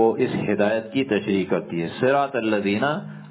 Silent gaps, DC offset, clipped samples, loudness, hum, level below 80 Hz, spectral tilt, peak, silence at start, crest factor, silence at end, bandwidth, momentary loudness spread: none; under 0.1%; under 0.1%; -23 LUFS; none; -60 dBFS; -10.5 dB/octave; -6 dBFS; 0 s; 16 dB; 0 s; 4 kHz; 5 LU